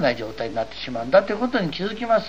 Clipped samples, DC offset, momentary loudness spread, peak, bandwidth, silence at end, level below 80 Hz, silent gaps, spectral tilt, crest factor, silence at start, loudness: under 0.1%; 0.9%; 9 LU; -4 dBFS; 8.2 kHz; 0 s; -50 dBFS; none; -6 dB/octave; 18 dB; 0 s; -23 LUFS